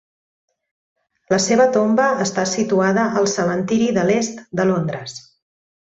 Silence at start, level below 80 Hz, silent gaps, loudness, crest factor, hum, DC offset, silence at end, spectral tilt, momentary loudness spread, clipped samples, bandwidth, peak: 1.3 s; -58 dBFS; none; -18 LUFS; 16 dB; none; under 0.1%; 0.75 s; -4.5 dB/octave; 9 LU; under 0.1%; 8.2 kHz; -4 dBFS